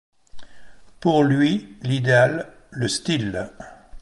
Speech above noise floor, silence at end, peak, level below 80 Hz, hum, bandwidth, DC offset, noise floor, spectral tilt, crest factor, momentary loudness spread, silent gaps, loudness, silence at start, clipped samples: 25 dB; 0 s; -4 dBFS; -52 dBFS; none; 11.5 kHz; under 0.1%; -45 dBFS; -5.5 dB/octave; 18 dB; 19 LU; none; -21 LUFS; 0.35 s; under 0.1%